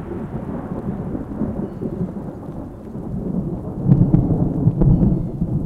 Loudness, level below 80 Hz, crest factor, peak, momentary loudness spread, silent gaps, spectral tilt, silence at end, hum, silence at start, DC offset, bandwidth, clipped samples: -21 LUFS; -30 dBFS; 18 dB; -2 dBFS; 15 LU; none; -12 dB/octave; 0 s; none; 0 s; under 0.1%; 2.9 kHz; under 0.1%